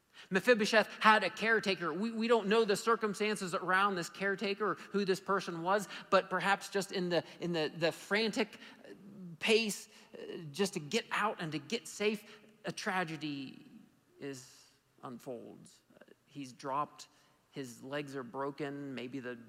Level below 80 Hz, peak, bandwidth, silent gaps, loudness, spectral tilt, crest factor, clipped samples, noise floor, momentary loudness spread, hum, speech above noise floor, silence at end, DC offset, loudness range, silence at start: -84 dBFS; -12 dBFS; 16 kHz; none; -34 LUFS; -4 dB/octave; 24 dB; under 0.1%; -62 dBFS; 19 LU; none; 28 dB; 0 s; under 0.1%; 14 LU; 0.15 s